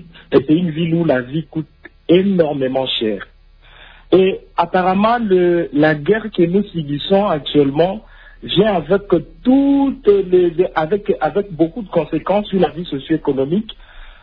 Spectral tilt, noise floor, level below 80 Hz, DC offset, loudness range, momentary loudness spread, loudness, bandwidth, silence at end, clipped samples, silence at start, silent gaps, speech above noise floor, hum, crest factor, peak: -10 dB/octave; -44 dBFS; -44 dBFS; under 0.1%; 3 LU; 8 LU; -16 LUFS; 5.2 kHz; 0.1 s; under 0.1%; 0.3 s; none; 29 dB; none; 14 dB; -2 dBFS